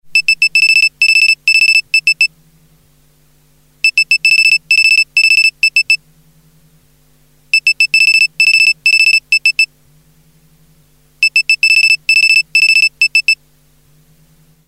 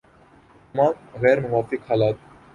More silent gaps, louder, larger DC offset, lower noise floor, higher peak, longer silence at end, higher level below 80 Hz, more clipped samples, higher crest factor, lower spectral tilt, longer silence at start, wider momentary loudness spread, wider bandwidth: neither; first, -8 LUFS vs -22 LUFS; first, 0.1% vs under 0.1%; about the same, -51 dBFS vs -53 dBFS; first, 0 dBFS vs -4 dBFS; first, 1.35 s vs 0.4 s; about the same, -58 dBFS vs -56 dBFS; neither; second, 12 dB vs 18 dB; second, 3.5 dB/octave vs -8 dB/octave; second, 0.1 s vs 0.75 s; about the same, 6 LU vs 7 LU; first, 15 kHz vs 9.6 kHz